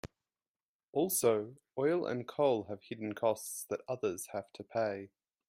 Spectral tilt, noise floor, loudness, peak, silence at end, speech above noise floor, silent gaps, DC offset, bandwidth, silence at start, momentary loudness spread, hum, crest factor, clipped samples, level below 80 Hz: -4.5 dB/octave; under -90 dBFS; -35 LUFS; -16 dBFS; 0.4 s; over 55 dB; 0.48-0.54 s, 0.63-0.79 s, 0.88-0.93 s; under 0.1%; 16 kHz; 0.05 s; 13 LU; none; 20 dB; under 0.1%; -74 dBFS